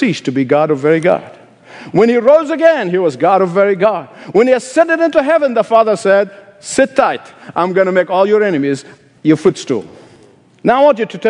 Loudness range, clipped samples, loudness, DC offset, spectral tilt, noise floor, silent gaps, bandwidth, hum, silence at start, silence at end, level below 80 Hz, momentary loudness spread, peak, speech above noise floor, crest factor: 3 LU; 0.2%; -13 LUFS; under 0.1%; -5.5 dB/octave; -45 dBFS; none; 10.5 kHz; none; 0 s; 0 s; -58 dBFS; 8 LU; 0 dBFS; 33 dB; 12 dB